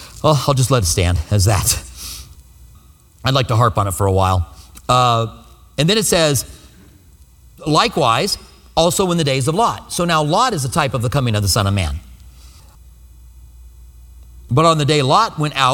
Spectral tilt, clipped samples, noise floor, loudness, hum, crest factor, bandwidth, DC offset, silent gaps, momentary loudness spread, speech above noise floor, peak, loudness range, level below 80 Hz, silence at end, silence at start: -4.5 dB/octave; under 0.1%; -46 dBFS; -16 LUFS; none; 18 dB; 18.5 kHz; under 0.1%; none; 11 LU; 31 dB; 0 dBFS; 5 LU; -36 dBFS; 0 s; 0 s